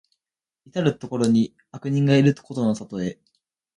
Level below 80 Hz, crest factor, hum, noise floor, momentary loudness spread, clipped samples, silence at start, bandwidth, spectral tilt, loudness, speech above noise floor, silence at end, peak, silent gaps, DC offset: -62 dBFS; 18 dB; none; -89 dBFS; 13 LU; under 0.1%; 0.75 s; 11.5 kHz; -7 dB/octave; -23 LUFS; 68 dB; 0.65 s; -6 dBFS; none; under 0.1%